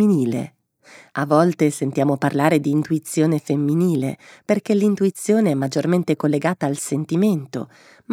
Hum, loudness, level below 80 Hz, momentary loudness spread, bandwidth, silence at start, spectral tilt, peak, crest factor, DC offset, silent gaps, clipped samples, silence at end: none; -20 LUFS; -70 dBFS; 10 LU; 16 kHz; 0 s; -6.5 dB/octave; 0 dBFS; 18 dB; under 0.1%; none; under 0.1%; 0 s